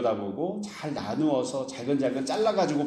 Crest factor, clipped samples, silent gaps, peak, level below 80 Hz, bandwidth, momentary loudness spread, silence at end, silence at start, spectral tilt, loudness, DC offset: 16 dB; under 0.1%; none; -12 dBFS; -70 dBFS; 12 kHz; 8 LU; 0 s; 0 s; -5.5 dB/octave; -28 LUFS; under 0.1%